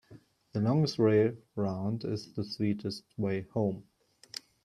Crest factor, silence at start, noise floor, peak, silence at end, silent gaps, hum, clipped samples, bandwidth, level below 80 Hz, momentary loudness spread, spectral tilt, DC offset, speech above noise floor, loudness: 18 dB; 0.1 s; -57 dBFS; -14 dBFS; 0.8 s; none; none; under 0.1%; 12.5 kHz; -70 dBFS; 15 LU; -7.5 dB/octave; under 0.1%; 27 dB; -31 LUFS